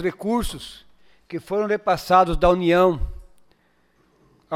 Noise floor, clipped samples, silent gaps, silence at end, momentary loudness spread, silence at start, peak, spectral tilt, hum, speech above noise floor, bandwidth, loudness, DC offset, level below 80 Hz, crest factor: -63 dBFS; under 0.1%; none; 0 s; 18 LU; 0 s; -4 dBFS; -6 dB/octave; none; 43 dB; 16 kHz; -20 LUFS; under 0.1%; -36 dBFS; 18 dB